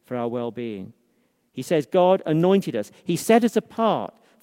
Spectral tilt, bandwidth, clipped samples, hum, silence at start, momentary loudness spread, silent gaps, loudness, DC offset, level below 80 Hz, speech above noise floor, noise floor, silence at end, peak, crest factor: -6 dB/octave; 16 kHz; under 0.1%; none; 0.1 s; 16 LU; none; -22 LUFS; under 0.1%; -70 dBFS; 45 dB; -67 dBFS; 0.35 s; -4 dBFS; 18 dB